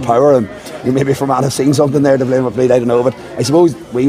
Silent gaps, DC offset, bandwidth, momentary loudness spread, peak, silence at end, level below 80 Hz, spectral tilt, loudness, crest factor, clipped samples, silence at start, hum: none; under 0.1%; 16 kHz; 7 LU; 0 dBFS; 0 s; -48 dBFS; -6.5 dB/octave; -13 LUFS; 12 dB; under 0.1%; 0 s; none